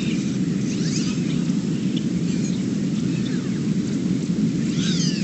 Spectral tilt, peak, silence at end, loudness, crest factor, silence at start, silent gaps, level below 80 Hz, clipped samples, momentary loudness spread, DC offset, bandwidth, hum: -6 dB/octave; -8 dBFS; 0 s; -23 LUFS; 14 dB; 0 s; none; -50 dBFS; under 0.1%; 2 LU; under 0.1%; 8.6 kHz; none